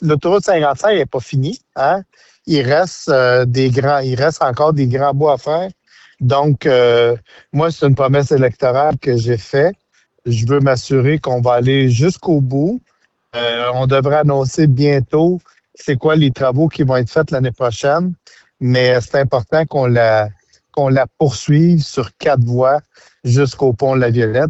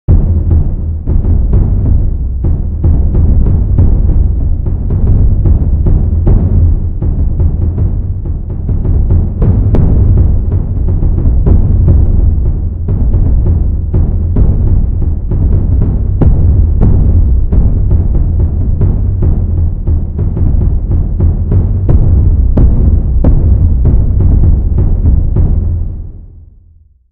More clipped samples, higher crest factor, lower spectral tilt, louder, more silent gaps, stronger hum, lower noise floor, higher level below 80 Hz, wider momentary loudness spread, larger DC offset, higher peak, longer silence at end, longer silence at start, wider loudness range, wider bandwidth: second, under 0.1% vs 0.3%; about the same, 12 dB vs 8 dB; second, -7 dB/octave vs -14 dB/octave; second, -15 LUFS vs -12 LUFS; neither; neither; first, -53 dBFS vs -42 dBFS; second, -48 dBFS vs -10 dBFS; about the same, 7 LU vs 5 LU; second, under 0.1% vs 0.7%; about the same, -2 dBFS vs 0 dBFS; second, 0 s vs 0.7 s; about the same, 0 s vs 0.1 s; about the same, 1 LU vs 2 LU; first, 8.2 kHz vs 1.9 kHz